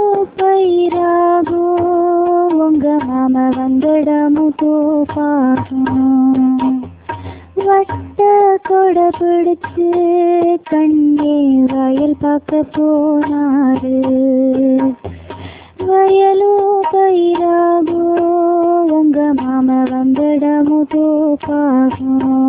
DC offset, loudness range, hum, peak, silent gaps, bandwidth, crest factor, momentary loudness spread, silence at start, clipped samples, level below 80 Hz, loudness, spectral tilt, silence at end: under 0.1%; 2 LU; none; -2 dBFS; none; 4 kHz; 10 dB; 4 LU; 0 s; under 0.1%; -46 dBFS; -13 LUFS; -11 dB/octave; 0 s